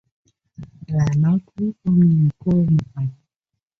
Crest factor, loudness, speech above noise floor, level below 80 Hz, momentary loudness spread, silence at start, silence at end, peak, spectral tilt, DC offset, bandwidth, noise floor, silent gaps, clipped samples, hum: 12 dB; -19 LUFS; 64 dB; -48 dBFS; 12 LU; 0.6 s; 0.65 s; -8 dBFS; -10 dB/octave; under 0.1%; 6.6 kHz; -82 dBFS; none; under 0.1%; none